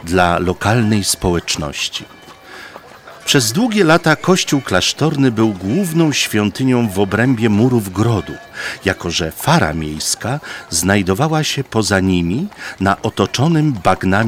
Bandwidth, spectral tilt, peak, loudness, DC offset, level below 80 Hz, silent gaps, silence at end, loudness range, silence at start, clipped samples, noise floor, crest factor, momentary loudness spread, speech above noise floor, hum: 17 kHz; -4.5 dB/octave; 0 dBFS; -15 LUFS; under 0.1%; -40 dBFS; none; 0 s; 3 LU; 0 s; under 0.1%; -37 dBFS; 16 dB; 8 LU; 22 dB; none